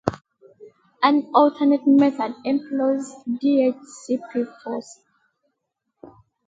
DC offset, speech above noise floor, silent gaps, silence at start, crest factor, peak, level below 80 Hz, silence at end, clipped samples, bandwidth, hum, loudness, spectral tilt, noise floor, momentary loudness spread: under 0.1%; 57 dB; none; 0.05 s; 22 dB; 0 dBFS; -62 dBFS; 0.4 s; under 0.1%; 7.8 kHz; none; -21 LUFS; -6 dB/octave; -78 dBFS; 13 LU